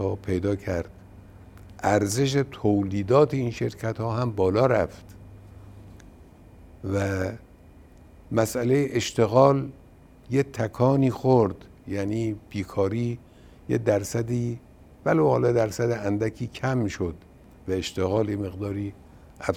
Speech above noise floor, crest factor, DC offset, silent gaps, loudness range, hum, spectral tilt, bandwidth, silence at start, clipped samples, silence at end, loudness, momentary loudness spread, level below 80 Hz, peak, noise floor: 26 dB; 22 dB; under 0.1%; none; 6 LU; none; -6.5 dB/octave; 16.5 kHz; 0 s; under 0.1%; 0 s; -25 LUFS; 12 LU; -52 dBFS; -4 dBFS; -50 dBFS